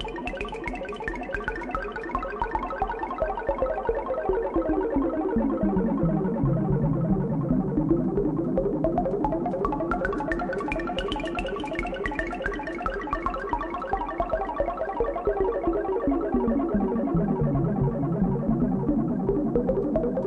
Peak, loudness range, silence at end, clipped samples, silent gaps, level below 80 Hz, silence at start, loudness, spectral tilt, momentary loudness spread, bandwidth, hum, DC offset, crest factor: -10 dBFS; 4 LU; 0 s; under 0.1%; none; -38 dBFS; 0 s; -27 LUFS; -8.5 dB/octave; 6 LU; 10.5 kHz; none; under 0.1%; 16 dB